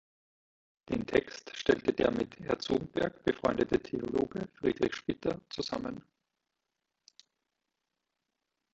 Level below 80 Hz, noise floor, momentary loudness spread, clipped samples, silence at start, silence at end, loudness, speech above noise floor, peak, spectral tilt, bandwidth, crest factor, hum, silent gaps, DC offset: -60 dBFS; -86 dBFS; 8 LU; under 0.1%; 0.9 s; 2.75 s; -33 LUFS; 54 dB; -12 dBFS; -6 dB/octave; 8 kHz; 24 dB; none; none; under 0.1%